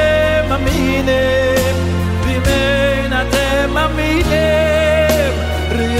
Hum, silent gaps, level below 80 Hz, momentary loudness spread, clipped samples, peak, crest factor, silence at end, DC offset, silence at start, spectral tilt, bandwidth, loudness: none; none; -22 dBFS; 4 LU; under 0.1%; -2 dBFS; 12 dB; 0 s; under 0.1%; 0 s; -5.5 dB/octave; 16 kHz; -14 LUFS